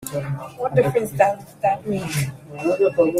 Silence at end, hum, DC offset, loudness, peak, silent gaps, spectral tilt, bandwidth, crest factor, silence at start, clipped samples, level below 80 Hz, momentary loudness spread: 0 s; none; under 0.1%; -22 LUFS; -2 dBFS; none; -6 dB/octave; 16 kHz; 18 dB; 0 s; under 0.1%; -54 dBFS; 9 LU